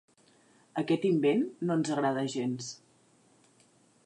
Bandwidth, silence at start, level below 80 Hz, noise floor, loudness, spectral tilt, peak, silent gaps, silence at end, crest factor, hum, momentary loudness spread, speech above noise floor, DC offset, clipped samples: 10.5 kHz; 0.75 s; -82 dBFS; -65 dBFS; -30 LUFS; -6 dB/octave; -16 dBFS; none; 1.3 s; 16 dB; none; 13 LU; 35 dB; under 0.1%; under 0.1%